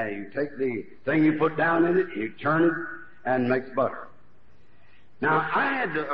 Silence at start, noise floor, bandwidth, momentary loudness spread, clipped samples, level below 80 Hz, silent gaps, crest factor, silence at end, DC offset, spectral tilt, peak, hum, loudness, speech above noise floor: 0 s; -60 dBFS; 5.4 kHz; 9 LU; under 0.1%; -66 dBFS; none; 16 dB; 0 s; 0.7%; -5 dB/octave; -10 dBFS; none; -25 LUFS; 35 dB